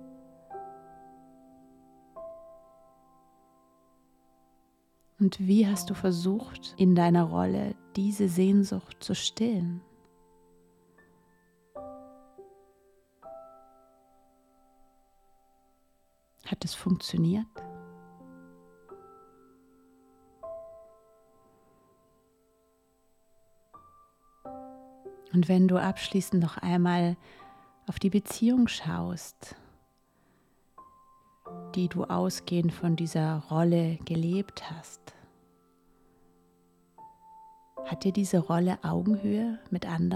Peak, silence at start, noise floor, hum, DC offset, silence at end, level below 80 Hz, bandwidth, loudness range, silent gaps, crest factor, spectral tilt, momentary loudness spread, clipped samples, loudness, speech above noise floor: -12 dBFS; 0 s; -68 dBFS; none; under 0.1%; 0 s; -64 dBFS; 14 kHz; 25 LU; none; 18 dB; -6.5 dB/octave; 25 LU; under 0.1%; -28 LUFS; 41 dB